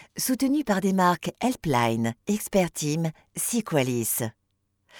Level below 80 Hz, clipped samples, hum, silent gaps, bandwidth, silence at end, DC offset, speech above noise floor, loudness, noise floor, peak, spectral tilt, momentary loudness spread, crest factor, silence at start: -56 dBFS; under 0.1%; none; none; over 20 kHz; 0 s; under 0.1%; 48 dB; -25 LUFS; -74 dBFS; -8 dBFS; -4.5 dB/octave; 6 LU; 18 dB; 0 s